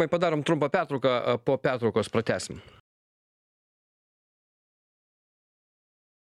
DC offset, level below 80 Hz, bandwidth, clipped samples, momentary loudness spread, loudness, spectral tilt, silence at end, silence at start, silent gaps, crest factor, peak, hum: under 0.1%; -66 dBFS; 12 kHz; under 0.1%; 6 LU; -26 LUFS; -5.5 dB/octave; 3.7 s; 0 s; none; 20 dB; -10 dBFS; none